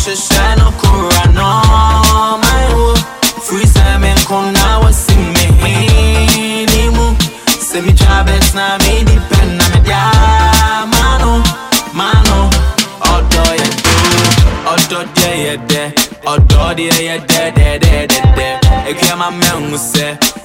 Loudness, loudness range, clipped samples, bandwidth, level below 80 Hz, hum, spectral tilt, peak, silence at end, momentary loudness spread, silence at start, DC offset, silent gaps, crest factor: -10 LUFS; 1 LU; under 0.1%; 16.5 kHz; -12 dBFS; none; -4 dB/octave; 0 dBFS; 0 s; 4 LU; 0 s; under 0.1%; none; 10 dB